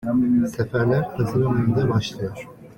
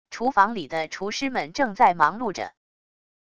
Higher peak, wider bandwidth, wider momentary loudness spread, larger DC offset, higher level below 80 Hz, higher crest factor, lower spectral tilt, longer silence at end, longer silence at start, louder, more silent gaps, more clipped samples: second, -8 dBFS vs -4 dBFS; first, 17 kHz vs 10 kHz; about the same, 11 LU vs 11 LU; second, under 0.1% vs 0.4%; first, -48 dBFS vs -60 dBFS; second, 14 dB vs 22 dB; first, -7.5 dB/octave vs -4 dB/octave; second, 0.05 s vs 0.7 s; about the same, 0 s vs 0.05 s; about the same, -22 LUFS vs -23 LUFS; neither; neither